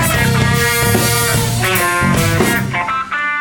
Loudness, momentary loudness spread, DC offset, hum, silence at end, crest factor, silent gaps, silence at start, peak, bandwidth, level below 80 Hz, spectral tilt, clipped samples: -14 LUFS; 5 LU; under 0.1%; none; 0 s; 12 dB; none; 0 s; -2 dBFS; 17.5 kHz; -32 dBFS; -4 dB/octave; under 0.1%